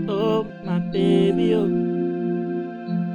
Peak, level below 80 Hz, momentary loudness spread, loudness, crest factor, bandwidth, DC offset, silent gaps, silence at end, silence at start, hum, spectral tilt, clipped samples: -8 dBFS; -54 dBFS; 9 LU; -22 LUFS; 14 dB; 9.6 kHz; under 0.1%; none; 0 s; 0 s; none; -8.5 dB/octave; under 0.1%